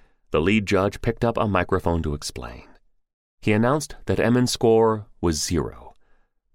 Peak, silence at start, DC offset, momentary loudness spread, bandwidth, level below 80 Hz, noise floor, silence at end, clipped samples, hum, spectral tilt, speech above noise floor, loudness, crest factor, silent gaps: -4 dBFS; 0.3 s; under 0.1%; 10 LU; 16 kHz; -40 dBFS; -59 dBFS; 0.65 s; under 0.1%; none; -5.5 dB/octave; 38 dB; -22 LUFS; 18 dB; 3.13-3.38 s